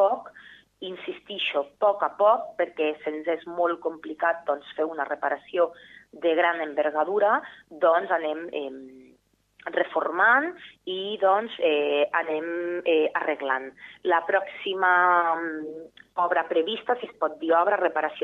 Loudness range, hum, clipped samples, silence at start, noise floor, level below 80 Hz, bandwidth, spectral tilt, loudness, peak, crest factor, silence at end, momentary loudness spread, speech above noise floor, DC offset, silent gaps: 3 LU; none; under 0.1%; 0 s; -62 dBFS; -74 dBFS; 5.8 kHz; -5.5 dB/octave; -25 LUFS; -8 dBFS; 18 dB; 0 s; 13 LU; 37 dB; under 0.1%; none